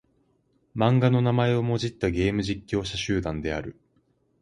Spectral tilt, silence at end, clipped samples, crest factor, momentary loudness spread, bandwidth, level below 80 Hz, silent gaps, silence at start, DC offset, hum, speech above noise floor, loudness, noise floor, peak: -6.5 dB/octave; 0.7 s; under 0.1%; 20 dB; 10 LU; 10.5 kHz; -46 dBFS; none; 0.75 s; under 0.1%; none; 43 dB; -25 LUFS; -68 dBFS; -6 dBFS